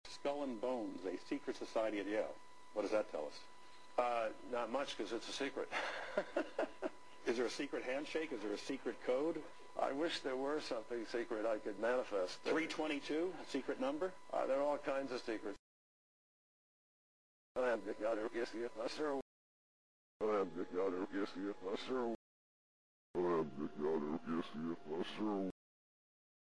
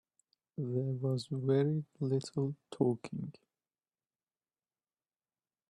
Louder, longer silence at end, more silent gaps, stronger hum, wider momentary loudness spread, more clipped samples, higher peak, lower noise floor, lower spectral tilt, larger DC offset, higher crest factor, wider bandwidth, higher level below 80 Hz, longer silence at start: second, -41 LUFS vs -35 LUFS; second, 1 s vs 2.4 s; first, 15.59-17.55 s, 19.22-20.20 s, 22.15-23.14 s vs none; neither; second, 7 LU vs 12 LU; neither; second, -24 dBFS vs -18 dBFS; about the same, under -90 dBFS vs under -90 dBFS; second, -4.5 dB/octave vs -8 dB/octave; first, 0.2% vs under 0.1%; about the same, 18 dB vs 20 dB; about the same, 11 kHz vs 11 kHz; about the same, -74 dBFS vs -76 dBFS; second, 0 s vs 0.6 s